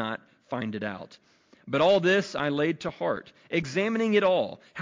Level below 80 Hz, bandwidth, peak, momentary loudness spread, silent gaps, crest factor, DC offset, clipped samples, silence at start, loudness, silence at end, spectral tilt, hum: -66 dBFS; 7.6 kHz; -12 dBFS; 13 LU; none; 14 dB; under 0.1%; under 0.1%; 0 s; -27 LUFS; 0 s; -5.5 dB/octave; none